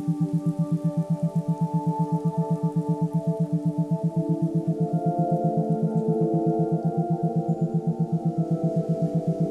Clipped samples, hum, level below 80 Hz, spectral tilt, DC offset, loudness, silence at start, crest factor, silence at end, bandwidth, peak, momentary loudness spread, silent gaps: under 0.1%; none; -62 dBFS; -11 dB/octave; under 0.1%; -25 LUFS; 0 s; 12 dB; 0 s; 1.9 kHz; -12 dBFS; 2 LU; none